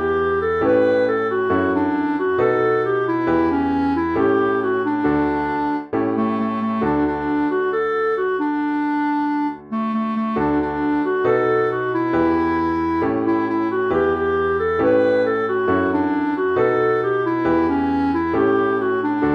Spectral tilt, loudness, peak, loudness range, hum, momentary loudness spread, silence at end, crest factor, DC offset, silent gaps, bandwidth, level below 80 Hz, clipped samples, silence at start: -8.5 dB/octave; -19 LUFS; -6 dBFS; 2 LU; none; 4 LU; 0 s; 12 dB; under 0.1%; none; 6 kHz; -46 dBFS; under 0.1%; 0 s